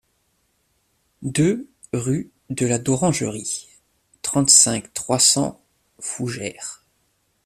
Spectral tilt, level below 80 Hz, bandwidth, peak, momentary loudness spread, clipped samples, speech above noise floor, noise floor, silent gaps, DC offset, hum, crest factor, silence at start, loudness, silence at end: -3 dB/octave; -56 dBFS; 15.5 kHz; 0 dBFS; 18 LU; under 0.1%; 47 dB; -67 dBFS; none; under 0.1%; none; 22 dB; 1.2 s; -19 LUFS; 0.7 s